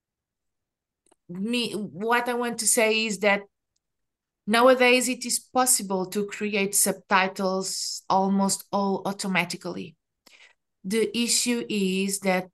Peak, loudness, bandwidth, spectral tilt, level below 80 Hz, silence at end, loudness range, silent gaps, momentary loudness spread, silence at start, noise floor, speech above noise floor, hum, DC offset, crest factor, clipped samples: -6 dBFS; -24 LUFS; 12.5 kHz; -3 dB/octave; -74 dBFS; 0.05 s; 5 LU; none; 11 LU; 1.3 s; -85 dBFS; 61 dB; none; under 0.1%; 20 dB; under 0.1%